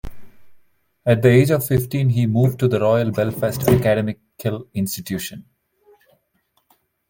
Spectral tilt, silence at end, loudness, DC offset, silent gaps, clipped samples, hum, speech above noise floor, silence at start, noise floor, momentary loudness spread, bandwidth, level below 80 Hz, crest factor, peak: -7 dB/octave; 1.7 s; -19 LUFS; under 0.1%; none; under 0.1%; none; 49 dB; 0.05 s; -67 dBFS; 13 LU; 17 kHz; -44 dBFS; 18 dB; -2 dBFS